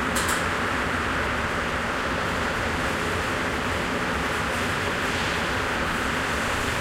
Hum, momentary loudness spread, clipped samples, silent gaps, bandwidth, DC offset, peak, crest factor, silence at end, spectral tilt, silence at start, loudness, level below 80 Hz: none; 1 LU; under 0.1%; none; 16 kHz; under 0.1%; -10 dBFS; 16 dB; 0 s; -3.5 dB/octave; 0 s; -25 LUFS; -38 dBFS